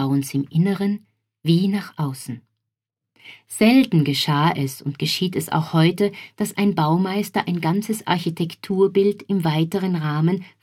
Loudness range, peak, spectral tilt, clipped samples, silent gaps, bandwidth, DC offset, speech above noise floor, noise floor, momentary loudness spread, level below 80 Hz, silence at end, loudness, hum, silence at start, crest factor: 3 LU; -2 dBFS; -6 dB/octave; under 0.1%; none; 16 kHz; under 0.1%; 63 dB; -83 dBFS; 10 LU; -64 dBFS; 0.15 s; -21 LUFS; none; 0 s; 18 dB